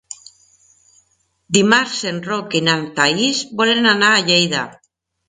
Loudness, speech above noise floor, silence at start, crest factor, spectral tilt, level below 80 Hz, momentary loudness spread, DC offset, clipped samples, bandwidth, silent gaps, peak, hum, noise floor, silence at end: -15 LUFS; 46 dB; 0.1 s; 18 dB; -3 dB/octave; -62 dBFS; 11 LU; under 0.1%; under 0.1%; 9.6 kHz; none; 0 dBFS; none; -63 dBFS; 0.55 s